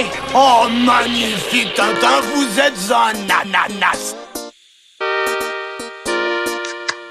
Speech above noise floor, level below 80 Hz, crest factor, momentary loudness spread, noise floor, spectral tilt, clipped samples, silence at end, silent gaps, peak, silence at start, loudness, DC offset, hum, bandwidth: 35 dB; -50 dBFS; 16 dB; 13 LU; -50 dBFS; -2.5 dB/octave; under 0.1%; 0 s; none; 0 dBFS; 0 s; -16 LUFS; under 0.1%; none; 15.5 kHz